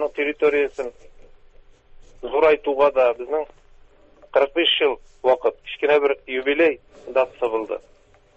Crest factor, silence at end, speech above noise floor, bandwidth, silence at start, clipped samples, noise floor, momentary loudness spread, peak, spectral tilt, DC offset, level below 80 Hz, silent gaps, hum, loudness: 18 dB; 0.6 s; 30 dB; 7.8 kHz; 0 s; under 0.1%; -51 dBFS; 13 LU; -4 dBFS; -4.5 dB/octave; under 0.1%; -56 dBFS; none; none; -21 LUFS